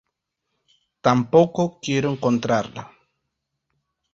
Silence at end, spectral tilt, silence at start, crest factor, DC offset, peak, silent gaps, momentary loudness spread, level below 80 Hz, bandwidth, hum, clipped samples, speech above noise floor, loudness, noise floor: 1.3 s; -6.5 dB/octave; 1.05 s; 22 dB; under 0.1%; -2 dBFS; none; 8 LU; -60 dBFS; 7.6 kHz; none; under 0.1%; 59 dB; -21 LUFS; -79 dBFS